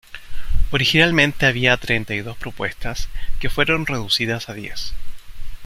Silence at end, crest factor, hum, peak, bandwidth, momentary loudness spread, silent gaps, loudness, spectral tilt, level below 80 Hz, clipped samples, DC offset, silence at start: 0 s; 18 dB; none; -2 dBFS; 15 kHz; 17 LU; none; -19 LUFS; -4.5 dB/octave; -28 dBFS; under 0.1%; under 0.1%; 0.1 s